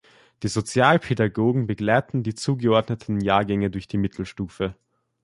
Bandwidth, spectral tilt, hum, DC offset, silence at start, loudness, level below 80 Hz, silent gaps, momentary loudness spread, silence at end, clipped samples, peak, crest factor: 11.5 kHz; -6 dB/octave; none; under 0.1%; 0.4 s; -23 LUFS; -50 dBFS; none; 11 LU; 0.5 s; under 0.1%; -4 dBFS; 20 dB